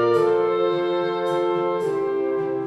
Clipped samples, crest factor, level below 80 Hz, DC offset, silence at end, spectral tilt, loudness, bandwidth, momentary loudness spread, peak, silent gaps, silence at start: under 0.1%; 14 dB; -70 dBFS; under 0.1%; 0 s; -7 dB/octave; -22 LUFS; 11.5 kHz; 4 LU; -8 dBFS; none; 0 s